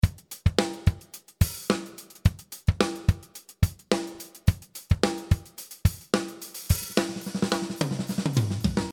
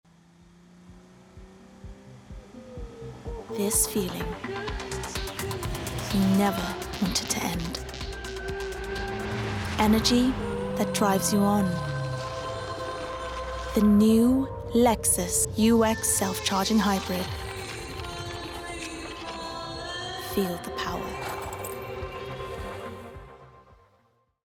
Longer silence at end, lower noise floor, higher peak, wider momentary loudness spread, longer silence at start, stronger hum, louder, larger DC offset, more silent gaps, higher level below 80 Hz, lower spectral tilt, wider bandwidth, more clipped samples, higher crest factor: second, 0 s vs 0.85 s; second, -46 dBFS vs -67 dBFS; first, -2 dBFS vs -8 dBFS; second, 10 LU vs 15 LU; second, 0.05 s vs 0.8 s; neither; about the same, -28 LUFS vs -27 LUFS; neither; neither; first, -34 dBFS vs -44 dBFS; first, -5.5 dB/octave vs -4 dB/octave; about the same, 19.5 kHz vs 18 kHz; neither; about the same, 24 dB vs 20 dB